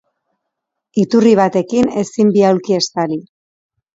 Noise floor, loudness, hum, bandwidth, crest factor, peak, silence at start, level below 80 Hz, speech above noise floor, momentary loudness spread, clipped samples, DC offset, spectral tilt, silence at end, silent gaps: -77 dBFS; -14 LUFS; none; 7.8 kHz; 16 dB; 0 dBFS; 0.95 s; -56 dBFS; 64 dB; 10 LU; under 0.1%; under 0.1%; -6 dB/octave; 0.75 s; none